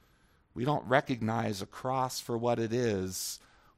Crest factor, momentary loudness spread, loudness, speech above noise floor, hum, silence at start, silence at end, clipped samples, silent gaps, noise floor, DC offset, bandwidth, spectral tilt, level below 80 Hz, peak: 22 dB; 9 LU; -32 LUFS; 35 dB; none; 0.55 s; 0.4 s; under 0.1%; none; -66 dBFS; under 0.1%; 16 kHz; -5 dB/octave; -66 dBFS; -10 dBFS